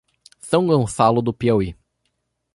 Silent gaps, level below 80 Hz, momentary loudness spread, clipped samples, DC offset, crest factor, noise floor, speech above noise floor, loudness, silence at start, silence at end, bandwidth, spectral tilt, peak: none; -46 dBFS; 5 LU; under 0.1%; under 0.1%; 18 dB; -73 dBFS; 55 dB; -19 LUFS; 0.45 s; 0.8 s; 11.5 kHz; -6.5 dB/octave; -2 dBFS